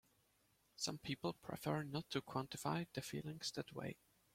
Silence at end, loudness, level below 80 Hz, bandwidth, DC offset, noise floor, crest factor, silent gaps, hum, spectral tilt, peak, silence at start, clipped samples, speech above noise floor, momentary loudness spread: 0.4 s; -45 LUFS; -76 dBFS; 16.5 kHz; under 0.1%; -78 dBFS; 20 dB; none; none; -4.5 dB/octave; -26 dBFS; 0.8 s; under 0.1%; 33 dB; 6 LU